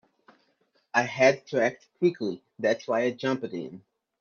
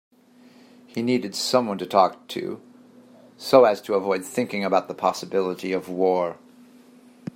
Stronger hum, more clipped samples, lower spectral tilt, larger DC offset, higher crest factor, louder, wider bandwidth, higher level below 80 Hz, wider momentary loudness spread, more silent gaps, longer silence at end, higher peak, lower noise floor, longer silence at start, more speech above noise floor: neither; neither; about the same, -5 dB/octave vs -4.5 dB/octave; neither; about the same, 22 dB vs 22 dB; second, -27 LUFS vs -23 LUFS; second, 7.2 kHz vs 16 kHz; about the same, -74 dBFS vs -74 dBFS; second, 12 LU vs 15 LU; neither; second, 0.45 s vs 1 s; second, -6 dBFS vs -2 dBFS; first, -70 dBFS vs -53 dBFS; about the same, 0.95 s vs 0.95 s; first, 44 dB vs 30 dB